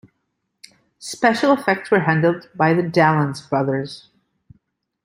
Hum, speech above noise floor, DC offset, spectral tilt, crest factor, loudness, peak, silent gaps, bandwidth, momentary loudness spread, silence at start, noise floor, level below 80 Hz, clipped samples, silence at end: none; 56 dB; under 0.1%; -6.5 dB/octave; 20 dB; -18 LUFS; -2 dBFS; none; 15.5 kHz; 15 LU; 1 s; -74 dBFS; -62 dBFS; under 0.1%; 1.05 s